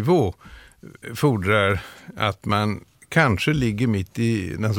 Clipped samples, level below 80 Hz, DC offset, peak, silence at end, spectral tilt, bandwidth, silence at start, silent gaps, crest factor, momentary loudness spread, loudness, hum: under 0.1%; -46 dBFS; under 0.1%; -4 dBFS; 0 s; -6.5 dB/octave; 17 kHz; 0 s; none; 18 dB; 10 LU; -22 LUFS; none